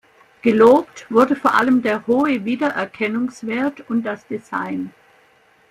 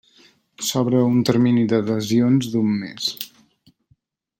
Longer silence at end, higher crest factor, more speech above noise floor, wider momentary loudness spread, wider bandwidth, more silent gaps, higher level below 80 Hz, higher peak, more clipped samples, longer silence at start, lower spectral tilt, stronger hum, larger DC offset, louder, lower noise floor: second, 0.8 s vs 1.15 s; about the same, 18 dB vs 16 dB; second, 37 dB vs 45 dB; first, 14 LU vs 8 LU; about the same, 15 kHz vs 16.5 kHz; neither; about the same, -60 dBFS vs -62 dBFS; about the same, -2 dBFS vs -4 dBFS; neither; second, 0.45 s vs 0.6 s; about the same, -6 dB/octave vs -5.5 dB/octave; neither; neither; about the same, -18 LUFS vs -20 LUFS; second, -55 dBFS vs -63 dBFS